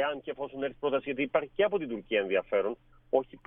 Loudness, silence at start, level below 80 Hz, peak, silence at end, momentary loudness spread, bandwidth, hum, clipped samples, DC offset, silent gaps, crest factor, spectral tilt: -31 LUFS; 0 s; -62 dBFS; -12 dBFS; 0.1 s; 7 LU; 3.8 kHz; none; under 0.1%; under 0.1%; none; 20 dB; -2.5 dB/octave